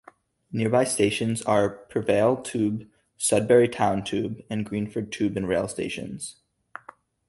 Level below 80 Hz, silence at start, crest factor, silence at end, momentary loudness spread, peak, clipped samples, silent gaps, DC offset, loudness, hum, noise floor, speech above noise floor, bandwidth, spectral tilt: -56 dBFS; 0.5 s; 20 dB; 1 s; 15 LU; -6 dBFS; under 0.1%; none; under 0.1%; -25 LUFS; none; -54 dBFS; 30 dB; 12 kHz; -5 dB/octave